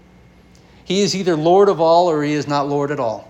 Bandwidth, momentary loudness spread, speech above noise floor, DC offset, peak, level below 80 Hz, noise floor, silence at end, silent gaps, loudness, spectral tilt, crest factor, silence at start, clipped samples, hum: 11.5 kHz; 7 LU; 31 dB; under 0.1%; -2 dBFS; -54 dBFS; -47 dBFS; 0.1 s; none; -16 LUFS; -5.5 dB/octave; 16 dB; 0.9 s; under 0.1%; 60 Hz at -40 dBFS